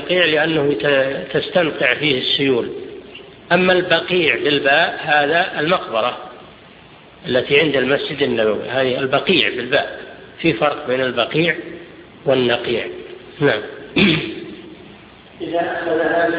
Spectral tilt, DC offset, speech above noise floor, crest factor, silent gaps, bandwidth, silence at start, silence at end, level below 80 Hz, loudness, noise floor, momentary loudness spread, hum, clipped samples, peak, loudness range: -7.5 dB/octave; under 0.1%; 26 dB; 18 dB; none; 5.2 kHz; 0 s; 0 s; -52 dBFS; -17 LUFS; -43 dBFS; 18 LU; none; under 0.1%; 0 dBFS; 4 LU